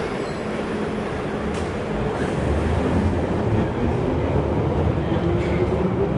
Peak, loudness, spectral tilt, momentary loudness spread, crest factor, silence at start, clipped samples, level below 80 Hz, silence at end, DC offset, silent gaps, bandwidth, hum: -8 dBFS; -23 LUFS; -8 dB/octave; 5 LU; 14 dB; 0 s; under 0.1%; -34 dBFS; 0 s; under 0.1%; none; 11 kHz; none